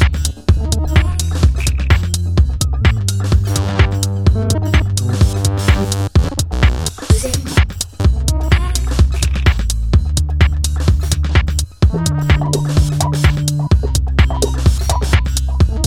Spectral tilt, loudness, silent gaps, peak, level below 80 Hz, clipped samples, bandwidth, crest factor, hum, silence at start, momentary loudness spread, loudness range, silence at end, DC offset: -5 dB/octave; -15 LUFS; none; 0 dBFS; -16 dBFS; under 0.1%; 16 kHz; 14 dB; none; 0 s; 3 LU; 1 LU; 0 s; under 0.1%